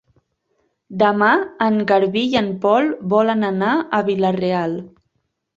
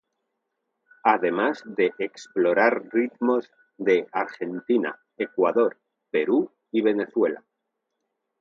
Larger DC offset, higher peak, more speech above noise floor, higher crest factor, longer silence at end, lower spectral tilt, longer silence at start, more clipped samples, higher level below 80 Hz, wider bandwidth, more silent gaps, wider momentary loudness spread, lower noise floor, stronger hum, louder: neither; about the same, -2 dBFS vs -4 dBFS; about the same, 54 dB vs 57 dB; second, 16 dB vs 22 dB; second, 0.7 s vs 1 s; about the same, -7 dB/octave vs -6 dB/octave; second, 0.9 s vs 1.05 s; neither; first, -60 dBFS vs -78 dBFS; about the same, 7.6 kHz vs 7.4 kHz; neither; second, 5 LU vs 9 LU; second, -71 dBFS vs -80 dBFS; neither; first, -18 LUFS vs -24 LUFS